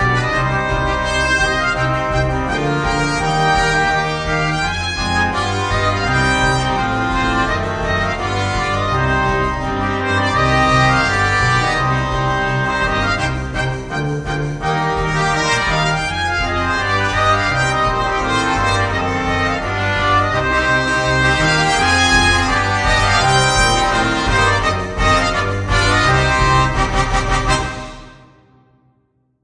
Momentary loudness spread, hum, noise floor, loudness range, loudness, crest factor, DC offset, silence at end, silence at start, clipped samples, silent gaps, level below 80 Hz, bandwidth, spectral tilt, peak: 6 LU; none; -62 dBFS; 4 LU; -16 LUFS; 16 dB; under 0.1%; 1.3 s; 0 s; under 0.1%; none; -28 dBFS; 10 kHz; -4 dB/octave; 0 dBFS